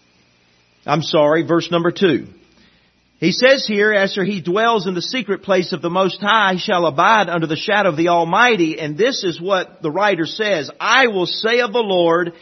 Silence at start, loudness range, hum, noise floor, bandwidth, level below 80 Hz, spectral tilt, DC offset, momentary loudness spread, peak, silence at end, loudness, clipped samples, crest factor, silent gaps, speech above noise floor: 0.85 s; 2 LU; none; -57 dBFS; 6.4 kHz; -64 dBFS; -4.5 dB/octave; under 0.1%; 7 LU; 0 dBFS; 0.1 s; -16 LUFS; under 0.1%; 16 dB; none; 40 dB